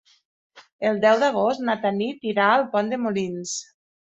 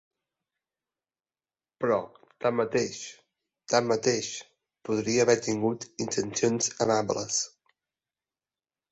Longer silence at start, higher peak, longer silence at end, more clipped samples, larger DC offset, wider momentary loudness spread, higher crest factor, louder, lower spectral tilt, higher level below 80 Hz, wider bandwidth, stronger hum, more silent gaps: second, 0.55 s vs 1.8 s; first, -4 dBFS vs -8 dBFS; second, 0.4 s vs 1.45 s; neither; neither; second, 9 LU vs 12 LU; about the same, 18 dB vs 22 dB; first, -22 LUFS vs -28 LUFS; about the same, -4 dB/octave vs -3.5 dB/octave; about the same, -70 dBFS vs -68 dBFS; about the same, 8.4 kHz vs 8.2 kHz; neither; first, 0.72-0.79 s vs none